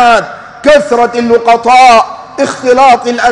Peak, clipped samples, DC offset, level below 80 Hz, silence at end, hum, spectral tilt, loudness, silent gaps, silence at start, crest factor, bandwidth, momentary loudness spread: 0 dBFS; 2%; under 0.1%; -40 dBFS; 0 s; none; -3 dB/octave; -7 LUFS; none; 0 s; 6 dB; 10.5 kHz; 11 LU